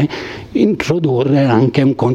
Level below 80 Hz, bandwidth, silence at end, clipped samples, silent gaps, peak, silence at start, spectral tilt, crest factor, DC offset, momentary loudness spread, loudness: -46 dBFS; 9.4 kHz; 0 s; under 0.1%; none; 0 dBFS; 0 s; -7.5 dB/octave; 12 dB; under 0.1%; 8 LU; -14 LUFS